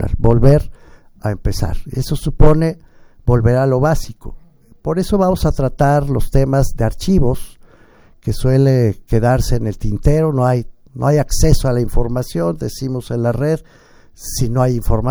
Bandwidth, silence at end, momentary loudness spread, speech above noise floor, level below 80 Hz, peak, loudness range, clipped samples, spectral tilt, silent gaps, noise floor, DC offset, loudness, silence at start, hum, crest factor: over 20 kHz; 0 s; 11 LU; 32 dB; -22 dBFS; 0 dBFS; 2 LU; under 0.1%; -7 dB/octave; none; -46 dBFS; under 0.1%; -16 LUFS; 0 s; none; 14 dB